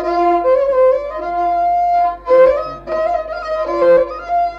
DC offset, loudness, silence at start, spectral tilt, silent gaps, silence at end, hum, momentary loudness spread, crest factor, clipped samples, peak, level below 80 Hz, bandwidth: under 0.1%; -15 LUFS; 0 s; -6.5 dB/octave; none; 0 s; 50 Hz at -45 dBFS; 9 LU; 12 dB; under 0.1%; -2 dBFS; -42 dBFS; 6.6 kHz